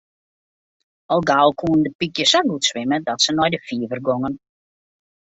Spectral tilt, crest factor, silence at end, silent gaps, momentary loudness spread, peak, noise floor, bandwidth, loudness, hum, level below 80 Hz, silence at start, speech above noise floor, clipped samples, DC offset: -3.5 dB/octave; 18 dB; 0.85 s; 1.95-1.99 s; 9 LU; -2 dBFS; under -90 dBFS; 8.2 kHz; -19 LUFS; none; -56 dBFS; 1.1 s; over 71 dB; under 0.1%; under 0.1%